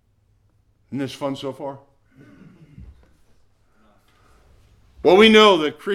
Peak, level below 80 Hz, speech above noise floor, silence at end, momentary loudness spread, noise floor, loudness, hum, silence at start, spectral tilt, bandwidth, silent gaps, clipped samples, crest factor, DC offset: -2 dBFS; -54 dBFS; 45 dB; 0 s; 23 LU; -61 dBFS; -16 LUFS; none; 0.9 s; -4.5 dB/octave; 13 kHz; none; under 0.1%; 20 dB; under 0.1%